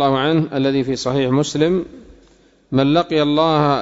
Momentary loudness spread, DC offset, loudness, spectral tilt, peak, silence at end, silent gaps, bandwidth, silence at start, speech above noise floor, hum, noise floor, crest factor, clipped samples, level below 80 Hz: 5 LU; under 0.1%; -17 LUFS; -6 dB/octave; -4 dBFS; 0 s; none; 8 kHz; 0 s; 36 dB; none; -52 dBFS; 14 dB; under 0.1%; -48 dBFS